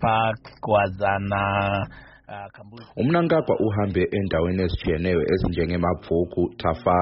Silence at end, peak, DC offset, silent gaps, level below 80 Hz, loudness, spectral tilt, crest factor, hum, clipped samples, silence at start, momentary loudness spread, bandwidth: 0 s; -6 dBFS; under 0.1%; none; -40 dBFS; -23 LUFS; -6 dB/octave; 16 dB; none; under 0.1%; 0 s; 13 LU; 5.8 kHz